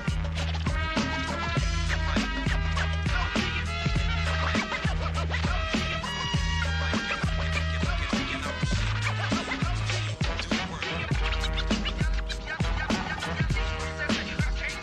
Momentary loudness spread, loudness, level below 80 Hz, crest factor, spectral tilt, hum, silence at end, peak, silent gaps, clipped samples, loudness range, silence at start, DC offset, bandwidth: 3 LU; -28 LUFS; -32 dBFS; 14 dB; -5 dB/octave; none; 0 s; -14 dBFS; none; under 0.1%; 2 LU; 0 s; under 0.1%; 11.5 kHz